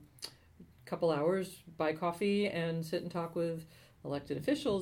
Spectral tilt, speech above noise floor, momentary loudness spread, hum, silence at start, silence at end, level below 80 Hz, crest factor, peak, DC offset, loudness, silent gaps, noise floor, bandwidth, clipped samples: -6 dB/octave; 25 dB; 15 LU; none; 0 s; 0 s; -66 dBFS; 16 dB; -20 dBFS; under 0.1%; -35 LUFS; none; -59 dBFS; 19 kHz; under 0.1%